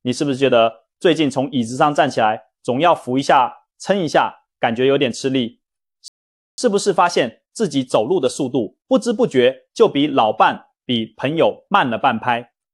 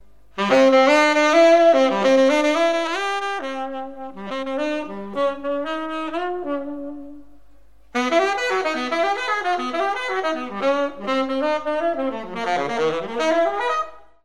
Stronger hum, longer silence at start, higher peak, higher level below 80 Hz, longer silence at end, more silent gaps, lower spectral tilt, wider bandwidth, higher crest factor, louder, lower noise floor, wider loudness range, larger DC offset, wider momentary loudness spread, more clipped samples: neither; second, 0.05 s vs 0.35 s; about the same, -2 dBFS vs -2 dBFS; second, -64 dBFS vs -56 dBFS; first, 0.3 s vs 0 s; first, 6.08-6.58 s vs none; first, -5 dB/octave vs -3.5 dB/octave; about the same, 12 kHz vs 12 kHz; about the same, 16 dB vs 18 dB; about the same, -18 LUFS vs -20 LUFS; about the same, -50 dBFS vs -53 dBFS; second, 3 LU vs 10 LU; second, under 0.1% vs 0.9%; second, 7 LU vs 14 LU; neither